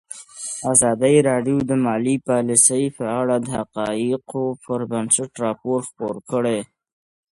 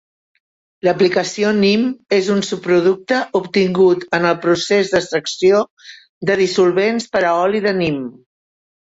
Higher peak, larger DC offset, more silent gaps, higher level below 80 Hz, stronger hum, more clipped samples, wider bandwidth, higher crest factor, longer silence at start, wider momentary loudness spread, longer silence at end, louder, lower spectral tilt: about the same, 0 dBFS vs -2 dBFS; neither; second, none vs 5.71-5.77 s, 6.09-6.21 s; about the same, -58 dBFS vs -56 dBFS; neither; neither; first, 11.5 kHz vs 8 kHz; first, 20 dB vs 14 dB; second, 0.1 s vs 0.85 s; first, 11 LU vs 5 LU; about the same, 0.7 s vs 0.8 s; second, -20 LUFS vs -16 LUFS; about the same, -4.5 dB/octave vs -5 dB/octave